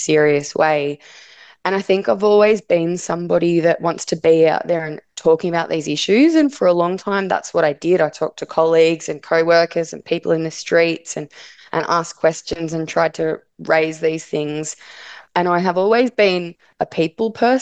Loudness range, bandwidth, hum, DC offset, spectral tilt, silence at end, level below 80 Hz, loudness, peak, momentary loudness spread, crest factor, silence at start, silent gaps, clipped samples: 4 LU; 9 kHz; none; under 0.1%; -5 dB/octave; 0 s; -58 dBFS; -17 LUFS; -2 dBFS; 11 LU; 16 dB; 0 s; none; under 0.1%